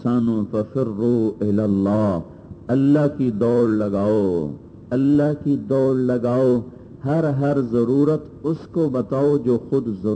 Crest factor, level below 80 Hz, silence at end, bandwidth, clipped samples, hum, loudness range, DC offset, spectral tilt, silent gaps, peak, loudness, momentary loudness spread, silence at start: 14 dB; -52 dBFS; 0 s; 8.8 kHz; under 0.1%; none; 1 LU; under 0.1%; -10 dB/octave; none; -6 dBFS; -20 LUFS; 8 LU; 0 s